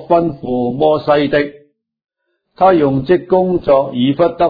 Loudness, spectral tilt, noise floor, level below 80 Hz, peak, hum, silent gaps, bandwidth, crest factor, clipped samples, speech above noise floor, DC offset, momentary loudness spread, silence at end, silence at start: -14 LUFS; -10 dB/octave; -54 dBFS; -46 dBFS; 0 dBFS; none; none; 5 kHz; 14 dB; under 0.1%; 41 dB; under 0.1%; 6 LU; 0 s; 0 s